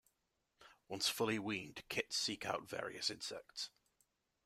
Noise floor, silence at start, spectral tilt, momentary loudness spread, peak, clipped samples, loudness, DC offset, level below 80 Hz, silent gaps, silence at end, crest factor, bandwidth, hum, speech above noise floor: -85 dBFS; 0.6 s; -2.5 dB/octave; 10 LU; -22 dBFS; under 0.1%; -41 LUFS; under 0.1%; -78 dBFS; none; 0.75 s; 22 dB; 16 kHz; none; 43 dB